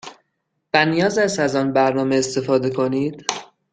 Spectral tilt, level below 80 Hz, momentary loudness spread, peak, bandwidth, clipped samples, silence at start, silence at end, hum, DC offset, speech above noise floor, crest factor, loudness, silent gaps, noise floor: -4.5 dB/octave; -60 dBFS; 7 LU; -2 dBFS; 9.4 kHz; under 0.1%; 0.05 s; 0.3 s; none; under 0.1%; 55 dB; 18 dB; -19 LUFS; none; -74 dBFS